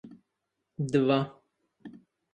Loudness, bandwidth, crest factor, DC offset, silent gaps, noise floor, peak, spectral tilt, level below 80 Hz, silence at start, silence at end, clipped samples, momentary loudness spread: -28 LUFS; 9.8 kHz; 22 dB; under 0.1%; none; -83 dBFS; -12 dBFS; -7.5 dB/octave; -72 dBFS; 0.05 s; 0.45 s; under 0.1%; 25 LU